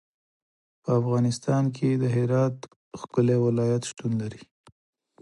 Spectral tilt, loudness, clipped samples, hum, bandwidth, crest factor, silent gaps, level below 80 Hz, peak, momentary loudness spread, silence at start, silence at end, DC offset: -7.5 dB/octave; -25 LUFS; under 0.1%; none; 11.5 kHz; 18 dB; 2.76-2.91 s; -64 dBFS; -10 dBFS; 14 LU; 0.85 s; 0.8 s; under 0.1%